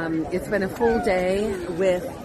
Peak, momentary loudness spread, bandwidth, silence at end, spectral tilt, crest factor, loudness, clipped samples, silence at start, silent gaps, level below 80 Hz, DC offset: -8 dBFS; 4 LU; 13.5 kHz; 0 s; -6 dB/octave; 14 dB; -23 LUFS; under 0.1%; 0 s; none; -44 dBFS; under 0.1%